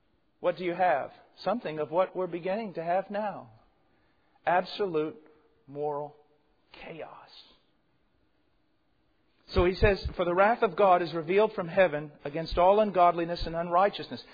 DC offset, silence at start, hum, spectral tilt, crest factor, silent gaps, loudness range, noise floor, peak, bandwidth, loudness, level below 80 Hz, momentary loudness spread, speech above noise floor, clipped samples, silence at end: under 0.1%; 0.4 s; none; -8 dB/octave; 20 dB; none; 15 LU; -73 dBFS; -10 dBFS; 5 kHz; -28 LUFS; -46 dBFS; 15 LU; 45 dB; under 0.1%; 0.1 s